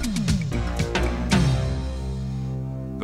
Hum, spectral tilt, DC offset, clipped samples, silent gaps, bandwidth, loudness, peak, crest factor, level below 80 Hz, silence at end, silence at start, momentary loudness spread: none; -6 dB/octave; under 0.1%; under 0.1%; none; 14 kHz; -25 LUFS; -8 dBFS; 16 dB; -30 dBFS; 0 s; 0 s; 9 LU